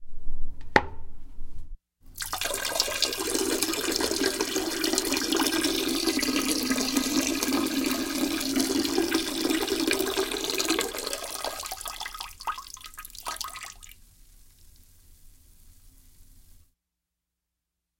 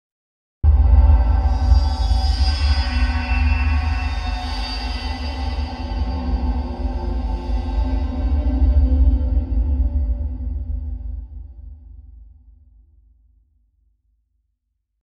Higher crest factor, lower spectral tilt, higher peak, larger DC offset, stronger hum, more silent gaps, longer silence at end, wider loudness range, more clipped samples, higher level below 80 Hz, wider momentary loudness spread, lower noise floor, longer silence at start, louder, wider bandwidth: first, 28 dB vs 16 dB; second, -2 dB/octave vs -7 dB/octave; about the same, 0 dBFS vs -2 dBFS; neither; neither; neither; second, 1.6 s vs 2.8 s; about the same, 13 LU vs 12 LU; neither; second, -44 dBFS vs -20 dBFS; first, 16 LU vs 11 LU; first, -85 dBFS vs -74 dBFS; second, 0 s vs 0.65 s; second, -27 LUFS vs -21 LUFS; first, 17 kHz vs 6.8 kHz